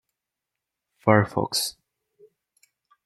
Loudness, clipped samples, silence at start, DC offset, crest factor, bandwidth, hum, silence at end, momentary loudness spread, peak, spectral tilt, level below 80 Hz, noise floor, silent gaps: -23 LUFS; under 0.1%; 1.05 s; under 0.1%; 26 dB; 13.5 kHz; none; 1.35 s; 8 LU; -2 dBFS; -4.5 dB/octave; -64 dBFS; -86 dBFS; none